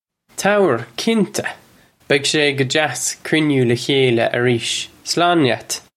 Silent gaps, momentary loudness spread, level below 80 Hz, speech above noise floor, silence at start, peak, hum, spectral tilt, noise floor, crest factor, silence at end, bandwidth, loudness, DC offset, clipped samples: none; 7 LU; -60 dBFS; 34 dB; 0.35 s; 0 dBFS; none; -4 dB/octave; -51 dBFS; 18 dB; 0.2 s; 15.5 kHz; -17 LUFS; under 0.1%; under 0.1%